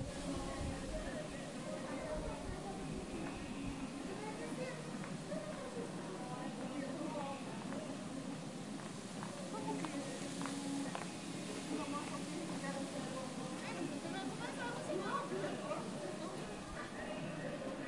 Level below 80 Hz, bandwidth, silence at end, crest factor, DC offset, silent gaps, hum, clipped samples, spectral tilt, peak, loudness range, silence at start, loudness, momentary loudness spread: -58 dBFS; 11.5 kHz; 0 s; 18 dB; under 0.1%; none; none; under 0.1%; -5 dB/octave; -26 dBFS; 2 LU; 0 s; -44 LUFS; 4 LU